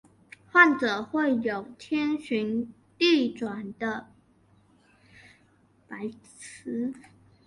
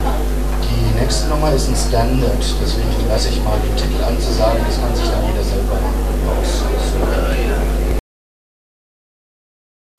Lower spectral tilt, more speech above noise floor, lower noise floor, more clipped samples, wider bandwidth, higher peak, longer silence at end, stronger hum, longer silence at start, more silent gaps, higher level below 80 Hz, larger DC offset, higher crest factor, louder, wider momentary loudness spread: about the same, -4.5 dB/octave vs -5.5 dB/octave; second, 36 dB vs over 75 dB; second, -63 dBFS vs under -90 dBFS; neither; second, 11.5 kHz vs 14 kHz; second, -6 dBFS vs -2 dBFS; second, 0.45 s vs 1.95 s; neither; first, 0.55 s vs 0 s; neither; second, -70 dBFS vs -18 dBFS; second, under 0.1% vs 2%; first, 24 dB vs 14 dB; second, -26 LUFS vs -18 LUFS; first, 20 LU vs 3 LU